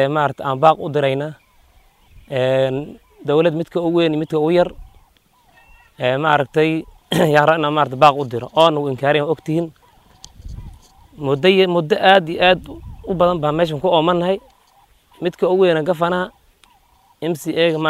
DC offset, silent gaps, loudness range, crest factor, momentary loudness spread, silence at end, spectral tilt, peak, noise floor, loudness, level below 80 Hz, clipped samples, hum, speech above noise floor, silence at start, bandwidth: under 0.1%; none; 4 LU; 18 dB; 13 LU; 0 s; -6 dB/octave; 0 dBFS; -55 dBFS; -17 LUFS; -46 dBFS; under 0.1%; none; 39 dB; 0 s; 15.5 kHz